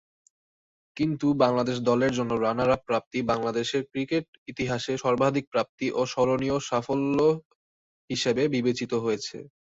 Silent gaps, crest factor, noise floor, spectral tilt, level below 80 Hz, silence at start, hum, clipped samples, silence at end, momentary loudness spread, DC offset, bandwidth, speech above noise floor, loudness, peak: 3.06-3.11 s, 4.28-4.46 s, 5.47-5.52 s, 5.69-5.78 s, 7.45-8.08 s; 20 dB; under -90 dBFS; -5.5 dB/octave; -58 dBFS; 0.95 s; none; under 0.1%; 0.25 s; 7 LU; under 0.1%; 8 kHz; over 64 dB; -26 LUFS; -6 dBFS